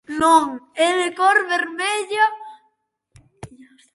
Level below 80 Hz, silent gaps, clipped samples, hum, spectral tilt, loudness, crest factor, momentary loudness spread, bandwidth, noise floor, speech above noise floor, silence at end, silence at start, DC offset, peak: -60 dBFS; none; under 0.1%; none; -2.5 dB/octave; -18 LUFS; 18 dB; 7 LU; 11.5 kHz; -68 dBFS; 50 dB; 0.5 s; 0.1 s; under 0.1%; -4 dBFS